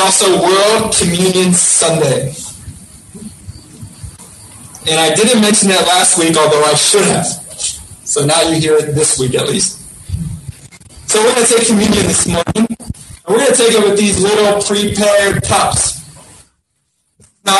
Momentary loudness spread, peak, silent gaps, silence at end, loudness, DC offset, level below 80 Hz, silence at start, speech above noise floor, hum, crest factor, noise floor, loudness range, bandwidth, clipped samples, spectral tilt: 19 LU; 0 dBFS; none; 0 s; -11 LUFS; under 0.1%; -38 dBFS; 0 s; 53 dB; none; 12 dB; -64 dBFS; 4 LU; 13 kHz; under 0.1%; -3 dB/octave